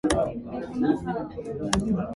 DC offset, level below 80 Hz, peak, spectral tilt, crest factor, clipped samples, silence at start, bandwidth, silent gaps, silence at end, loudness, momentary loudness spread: under 0.1%; -44 dBFS; -4 dBFS; -5.5 dB/octave; 22 dB; under 0.1%; 0.05 s; 11.5 kHz; none; 0 s; -28 LUFS; 8 LU